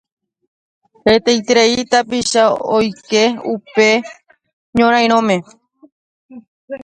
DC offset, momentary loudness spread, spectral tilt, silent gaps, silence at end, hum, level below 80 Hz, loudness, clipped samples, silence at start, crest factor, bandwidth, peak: under 0.1%; 8 LU; -3.5 dB/octave; 4.53-4.73 s, 5.92-6.29 s, 6.48-6.68 s; 0 s; none; -50 dBFS; -14 LUFS; under 0.1%; 1.05 s; 16 dB; 10 kHz; 0 dBFS